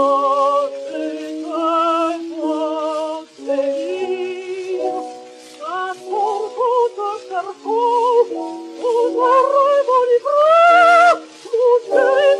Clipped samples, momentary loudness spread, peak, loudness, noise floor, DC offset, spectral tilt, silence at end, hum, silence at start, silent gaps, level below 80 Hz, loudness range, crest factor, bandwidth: under 0.1%; 14 LU; -4 dBFS; -17 LUFS; -37 dBFS; under 0.1%; -2.5 dB/octave; 0 s; none; 0 s; none; -80 dBFS; 10 LU; 14 dB; 11 kHz